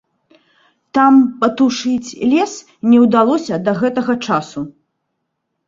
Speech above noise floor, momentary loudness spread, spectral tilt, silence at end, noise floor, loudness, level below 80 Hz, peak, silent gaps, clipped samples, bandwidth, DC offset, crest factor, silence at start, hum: 59 dB; 11 LU; -5.5 dB/octave; 1 s; -73 dBFS; -15 LUFS; -58 dBFS; -2 dBFS; none; under 0.1%; 7.6 kHz; under 0.1%; 14 dB; 0.95 s; none